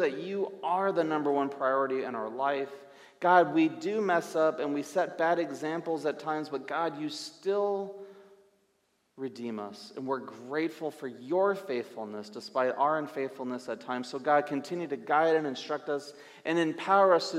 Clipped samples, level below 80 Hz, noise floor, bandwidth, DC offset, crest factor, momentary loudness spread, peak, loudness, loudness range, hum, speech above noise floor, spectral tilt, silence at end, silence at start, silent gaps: under 0.1%; -86 dBFS; -73 dBFS; 14.5 kHz; under 0.1%; 20 dB; 13 LU; -10 dBFS; -30 LUFS; 8 LU; none; 44 dB; -5 dB/octave; 0 s; 0 s; none